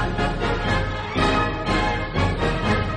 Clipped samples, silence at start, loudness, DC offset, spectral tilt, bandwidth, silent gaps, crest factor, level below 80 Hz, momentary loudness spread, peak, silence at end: under 0.1%; 0 s; -22 LUFS; under 0.1%; -6 dB/octave; 10 kHz; none; 16 dB; -30 dBFS; 3 LU; -6 dBFS; 0 s